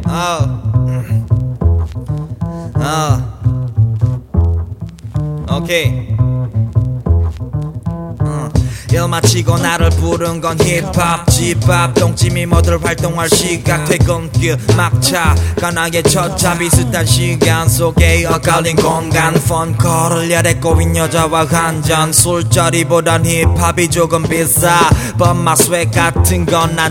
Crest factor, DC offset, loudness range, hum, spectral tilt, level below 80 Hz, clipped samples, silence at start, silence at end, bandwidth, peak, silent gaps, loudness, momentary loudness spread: 12 dB; under 0.1%; 5 LU; none; -4.5 dB/octave; -24 dBFS; under 0.1%; 0 s; 0 s; 17.5 kHz; 0 dBFS; none; -13 LUFS; 7 LU